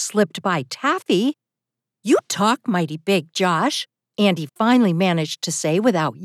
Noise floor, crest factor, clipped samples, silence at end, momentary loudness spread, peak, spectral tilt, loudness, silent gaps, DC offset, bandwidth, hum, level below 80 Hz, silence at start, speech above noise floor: -86 dBFS; 16 dB; under 0.1%; 0 s; 6 LU; -4 dBFS; -4.5 dB/octave; -20 LUFS; none; under 0.1%; 14.5 kHz; none; -86 dBFS; 0 s; 66 dB